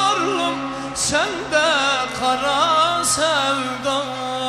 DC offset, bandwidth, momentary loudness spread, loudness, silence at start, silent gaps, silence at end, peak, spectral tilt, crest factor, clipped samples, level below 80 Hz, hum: under 0.1%; 15 kHz; 7 LU; -19 LUFS; 0 s; none; 0 s; -4 dBFS; -2 dB/octave; 16 dB; under 0.1%; -52 dBFS; none